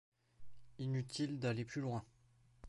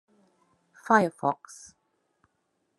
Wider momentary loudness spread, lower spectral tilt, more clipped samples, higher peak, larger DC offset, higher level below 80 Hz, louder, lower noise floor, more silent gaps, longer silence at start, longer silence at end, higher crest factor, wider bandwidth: second, 6 LU vs 25 LU; about the same, -6 dB/octave vs -5.5 dB/octave; neither; second, -26 dBFS vs -6 dBFS; neither; first, -72 dBFS vs -78 dBFS; second, -42 LUFS vs -26 LUFS; second, -70 dBFS vs -76 dBFS; neither; second, 0.1 s vs 0.9 s; second, 0 s vs 1.45 s; second, 18 dB vs 26 dB; about the same, 11.5 kHz vs 12.5 kHz